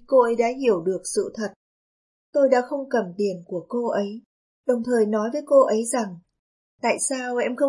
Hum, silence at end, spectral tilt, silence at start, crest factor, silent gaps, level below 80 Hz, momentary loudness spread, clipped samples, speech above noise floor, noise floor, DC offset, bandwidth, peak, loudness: none; 0 s; -4.5 dB/octave; 0.1 s; 18 dB; 1.56-2.33 s, 4.26-4.64 s, 6.39-6.78 s; -70 dBFS; 12 LU; under 0.1%; over 68 dB; under -90 dBFS; under 0.1%; 11.5 kHz; -6 dBFS; -23 LUFS